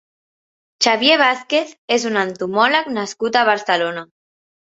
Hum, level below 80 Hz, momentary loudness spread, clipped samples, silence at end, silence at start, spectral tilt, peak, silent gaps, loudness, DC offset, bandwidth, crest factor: none; -66 dBFS; 9 LU; under 0.1%; 0.65 s; 0.8 s; -2.5 dB/octave; 0 dBFS; 1.78-1.88 s; -17 LUFS; under 0.1%; 8 kHz; 18 dB